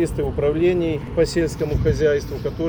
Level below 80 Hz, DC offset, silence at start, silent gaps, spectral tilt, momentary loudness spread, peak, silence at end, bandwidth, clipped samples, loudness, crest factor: -32 dBFS; under 0.1%; 0 s; none; -7 dB/octave; 4 LU; -8 dBFS; 0 s; over 20 kHz; under 0.1%; -21 LUFS; 12 dB